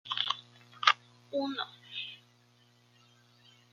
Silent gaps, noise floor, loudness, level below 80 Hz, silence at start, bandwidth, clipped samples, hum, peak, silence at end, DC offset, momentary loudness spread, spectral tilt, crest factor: none; -65 dBFS; -33 LUFS; -88 dBFS; 0.05 s; 13.5 kHz; under 0.1%; 60 Hz at -65 dBFS; -2 dBFS; 1.55 s; under 0.1%; 14 LU; -2 dB/octave; 36 dB